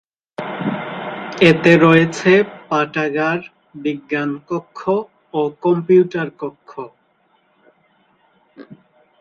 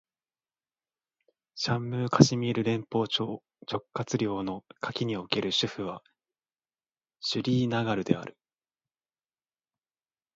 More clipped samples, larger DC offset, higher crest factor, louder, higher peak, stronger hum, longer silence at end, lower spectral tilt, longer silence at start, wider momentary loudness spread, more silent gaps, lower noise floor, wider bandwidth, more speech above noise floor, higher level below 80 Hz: neither; neither; second, 18 dB vs 30 dB; first, -17 LUFS vs -29 LUFS; about the same, 0 dBFS vs -2 dBFS; neither; second, 0.45 s vs 2.05 s; about the same, -6.5 dB/octave vs -5.5 dB/octave; second, 0.4 s vs 1.55 s; first, 19 LU vs 14 LU; neither; second, -60 dBFS vs under -90 dBFS; first, 9 kHz vs 7.8 kHz; second, 44 dB vs over 61 dB; first, -58 dBFS vs -66 dBFS